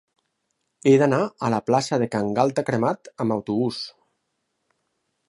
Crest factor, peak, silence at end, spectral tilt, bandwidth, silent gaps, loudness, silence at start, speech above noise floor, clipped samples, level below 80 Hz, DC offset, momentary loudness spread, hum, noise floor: 20 dB; -4 dBFS; 1.4 s; -6.5 dB/octave; 11.5 kHz; none; -22 LUFS; 0.85 s; 54 dB; under 0.1%; -64 dBFS; under 0.1%; 9 LU; none; -76 dBFS